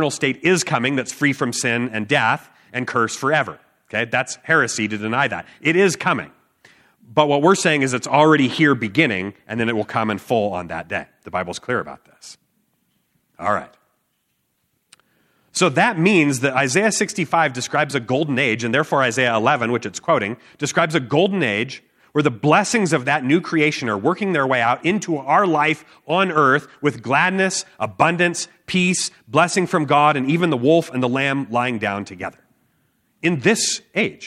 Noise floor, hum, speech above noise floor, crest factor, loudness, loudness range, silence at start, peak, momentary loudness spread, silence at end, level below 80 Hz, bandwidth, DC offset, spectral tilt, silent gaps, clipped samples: -70 dBFS; none; 51 dB; 20 dB; -19 LUFS; 7 LU; 0 s; 0 dBFS; 10 LU; 0 s; -64 dBFS; 14 kHz; under 0.1%; -4.5 dB/octave; none; under 0.1%